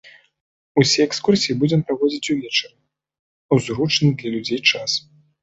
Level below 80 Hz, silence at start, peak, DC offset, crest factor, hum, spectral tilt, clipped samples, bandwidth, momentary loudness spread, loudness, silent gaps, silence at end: -58 dBFS; 0.05 s; -2 dBFS; under 0.1%; 18 dB; none; -4.5 dB/octave; under 0.1%; 8.2 kHz; 7 LU; -19 LUFS; 0.41-0.75 s, 3.19-3.49 s; 0.45 s